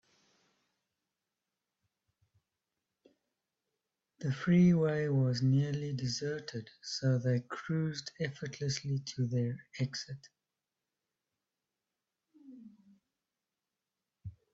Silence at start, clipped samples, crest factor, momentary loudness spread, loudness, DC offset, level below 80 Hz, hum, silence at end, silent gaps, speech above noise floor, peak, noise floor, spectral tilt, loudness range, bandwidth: 4.2 s; under 0.1%; 18 dB; 15 LU; -33 LUFS; under 0.1%; -70 dBFS; none; 0.2 s; none; over 58 dB; -18 dBFS; under -90 dBFS; -6.5 dB/octave; 13 LU; 7.8 kHz